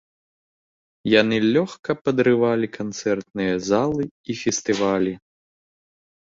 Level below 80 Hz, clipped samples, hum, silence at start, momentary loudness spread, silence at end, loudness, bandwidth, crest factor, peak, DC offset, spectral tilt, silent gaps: -58 dBFS; under 0.1%; none; 1.05 s; 9 LU; 1.05 s; -22 LUFS; 7.8 kHz; 20 dB; -2 dBFS; under 0.1%; -5 dB/octave; 1.79-1.83 s, 2.01-2.05 s, 4.11-4.24 s